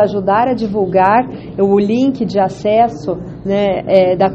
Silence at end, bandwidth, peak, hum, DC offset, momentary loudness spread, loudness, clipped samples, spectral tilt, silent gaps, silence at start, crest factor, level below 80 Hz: 0 s; 8 kHz; 0 dBFS; none; under 0.1%; 8 LU; -14 LUFS; under 0.1%; -7.5 dB/octave; none; 0 s; 14 dB; -44 dBFS